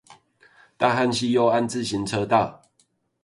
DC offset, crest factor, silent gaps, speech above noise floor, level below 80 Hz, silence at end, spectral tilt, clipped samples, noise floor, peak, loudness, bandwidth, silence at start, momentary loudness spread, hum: under 0.1%; 20 dB; none; 45 dB; -58 dBFS; 0.7 s; -5 dB/octave; under 0.1%; -67 dBFS; -4 dBFS; -22 LUFS; 11.5 kHz; 0.1 s; 6 LU; none